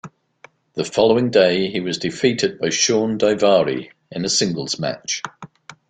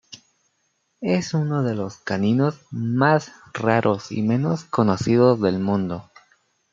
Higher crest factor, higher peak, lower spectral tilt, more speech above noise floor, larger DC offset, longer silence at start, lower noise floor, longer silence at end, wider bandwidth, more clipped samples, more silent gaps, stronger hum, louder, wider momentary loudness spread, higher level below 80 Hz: about the same, 18 dB vs 20 dB; about the same, -2 dBFS vs -2 dBFS; second, -3.5 dB/octave vs -7 dB/octave; second, 32 dB vs 49 dB; neither; about the same, 0.05 s vs 0.1 s; second, -50 dBFS vs -70 dBFS; second, 0.15 s vs 0.7 s; first, 9.4 kHz vs 7.6 kHz; neither; neither; neither; about the same, -19 LUFS vs -21 LUFS; about the same, 11 LU vs 11 LU; about the same, -58 dBFS vs -62 dBFS